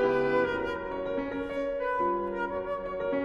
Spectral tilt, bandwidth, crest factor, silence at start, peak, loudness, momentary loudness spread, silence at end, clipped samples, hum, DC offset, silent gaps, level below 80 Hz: -7 dB/octave; 7.4 kHz; 16 dB; 0 s; -14 dBFS; -30 LUFS; 7 LU; 0 s; under 0.1%; none; under 0.1%; none; -52 dBFS